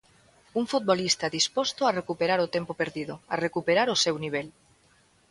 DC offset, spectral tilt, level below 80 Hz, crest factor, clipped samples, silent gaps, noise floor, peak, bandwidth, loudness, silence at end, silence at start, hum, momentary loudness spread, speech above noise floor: under 0.1%; -3 dB/octave; -66 dBFS; 20 dB; under 0.1%; none; -62 dBFS; -8 dBFS; 11.5 kHz; -27 LUFS; 0.8 s; 0.55 s; none; 9 LU; 36 dB